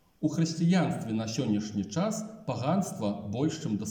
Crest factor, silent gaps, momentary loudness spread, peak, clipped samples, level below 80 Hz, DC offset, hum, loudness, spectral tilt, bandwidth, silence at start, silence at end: 14 dB; none; 7 LU; -16 dBFS; under 0.1%; -68 dBFS; under 0.1%; none; -30 LUFS; -6 dB/octave; 17 kHz; 0.2 s; 0 s